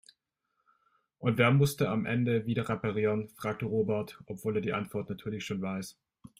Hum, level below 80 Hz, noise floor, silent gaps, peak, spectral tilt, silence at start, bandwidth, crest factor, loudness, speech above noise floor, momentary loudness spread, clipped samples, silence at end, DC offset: none; -66 dBFS; -81 dBFS; none; -12 dBFS; -6.5 dB/octave; 1.2 s; 16 kHz; 20 dB; -31 LUFS; 51 dB; 12 LU; under 0.1%; 0.5 s; under 0.1%